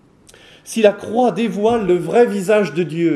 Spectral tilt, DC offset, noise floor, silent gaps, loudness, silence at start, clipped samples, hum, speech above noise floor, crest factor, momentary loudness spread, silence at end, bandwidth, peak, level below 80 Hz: -6 dB/octave; under 0.1%; -47 dBFS; none; -16 LUFS; 0.65 s; under 0.1%; none; 31 dB; 16 dB; 4 LU; 0 s; 13.5 kHz; 0 dBFS; -54 dBFS